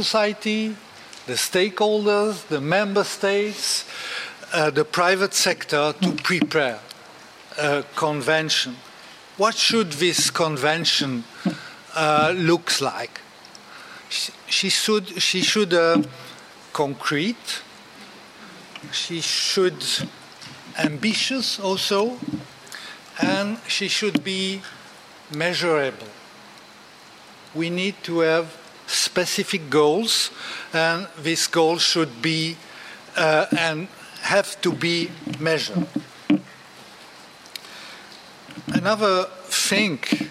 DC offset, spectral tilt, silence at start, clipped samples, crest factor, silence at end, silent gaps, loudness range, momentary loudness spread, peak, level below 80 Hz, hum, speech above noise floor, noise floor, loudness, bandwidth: under 0.1%; -3 dB/octave; 0 s; under 0.1%; 20 dB; 0 s; none; 5 LU; 21 LU; -4 dBFS; -68 dBFS; none; 24 dB; -46 dBFS; -22 LUFS; 16 kHz